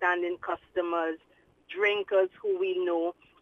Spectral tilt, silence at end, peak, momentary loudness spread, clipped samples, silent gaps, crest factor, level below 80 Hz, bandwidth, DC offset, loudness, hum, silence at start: -5 dB/octave; 0.3 s; -12 dBFS; 8 LU; under 0.1%; none; 18 dB; -72 dBFS; 6.6 kHz; under 0.1%; -29 LUFS; none; 0 s